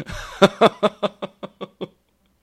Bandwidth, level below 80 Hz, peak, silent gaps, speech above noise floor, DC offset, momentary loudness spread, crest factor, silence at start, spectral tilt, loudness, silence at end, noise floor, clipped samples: 15.5 kHz; -48 dBFS; 0 dBFS; none; 44 dB; under 0.1%; 21 LU; 22 dB; 0 s; -5 dB/octave; -19 LUFS; 0.55 s; -64 dBFS; under 0.1%